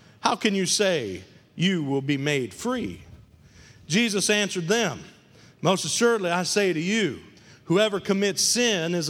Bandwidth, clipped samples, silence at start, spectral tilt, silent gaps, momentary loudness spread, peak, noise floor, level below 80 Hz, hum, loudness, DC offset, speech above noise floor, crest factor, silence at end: 16.5 kHz; under 0.1%; 0.25 s; -3.5 dB/octave; none; 8 LU; -2 dBFS; -51 dBFS; -62 dBFS; none; -23 LUFS; under 0.1%; 27 dB; 22 dB; 0 s